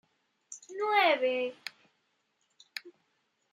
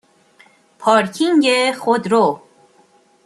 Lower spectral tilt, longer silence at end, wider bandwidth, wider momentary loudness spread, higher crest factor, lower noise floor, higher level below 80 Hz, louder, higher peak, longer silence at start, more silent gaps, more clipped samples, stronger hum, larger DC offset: second, -1 dB/octave vs -4 dB/octave; second, 0.6 s vs 0.9 s; about the same, 13.5 kHz vs 12.5 kHz; first, 21 LU vs 6 LU; about the same, 20 dB vs 16 dB; first, -77 dBFS vs -54 dBFS; second, under -90 dBFS vs -68 dBFS; second, -28 LUFS vs -16 LUFS; second, -14 dBFS vs -2 dBFS; second, 0.5 s vs 0.8 s; neither; neither; neither; neither